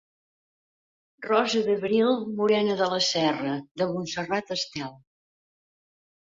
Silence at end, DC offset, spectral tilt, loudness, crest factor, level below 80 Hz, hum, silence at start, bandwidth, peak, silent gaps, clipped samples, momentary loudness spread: 1.25 s; under 0.1%; -4 dB/octave; -25 LUFS; 20 dB; -68 dBFS; none; 1.2 s; 7.8 kHz; -8 dBFS; 3.71-3.75 s; under 0.1%; 9 LU